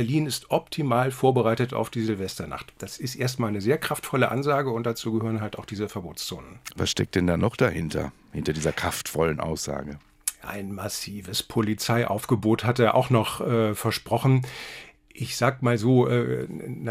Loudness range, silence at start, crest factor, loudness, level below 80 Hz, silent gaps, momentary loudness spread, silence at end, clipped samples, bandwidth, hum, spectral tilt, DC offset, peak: 4 LU; 0 s; 20 dB; -26 LUFS; -54 dBFS; none; 13 LU; 0 s; under 0.1%; 16 kHz; none; -5.5 dB/octave; under 0.1%; -4 dBFS